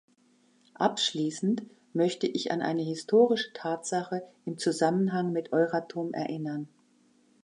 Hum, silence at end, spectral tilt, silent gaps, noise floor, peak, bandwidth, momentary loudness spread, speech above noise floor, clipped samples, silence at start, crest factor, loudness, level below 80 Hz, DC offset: none; 0.8 s; -5 dB/octave; none; -65 dBFS; -12 dBFS; 11.5 kHz; 10 LU; 37 dB; under 0.1%; 0.8 s; 18 dB; -29 LUFS; -80 dBFS; under 0.1%